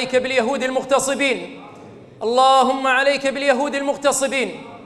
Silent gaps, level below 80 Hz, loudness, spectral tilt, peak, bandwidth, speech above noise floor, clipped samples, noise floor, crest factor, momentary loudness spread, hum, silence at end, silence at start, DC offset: none; -58 dBFS; -18 LUFS; -2 dB/octave; -4 dBFS; 14 kHz; 22 dB; under 0.1%; -41 dBFS; 16 dB; 12 LU; none; 0 s; 0 s; under 0.1%